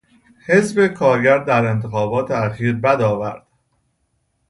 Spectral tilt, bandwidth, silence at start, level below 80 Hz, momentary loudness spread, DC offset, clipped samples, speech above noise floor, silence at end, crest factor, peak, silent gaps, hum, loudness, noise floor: -7 dB/octave; 11.5 kHz; 0.5 s; -54 dBFS; 9 LU; under 0.1%; under 0.1%; 51 dB; 1.1 s; 18 dB; -2 dBFS; none; none; -17 LUFS; -67 dBFS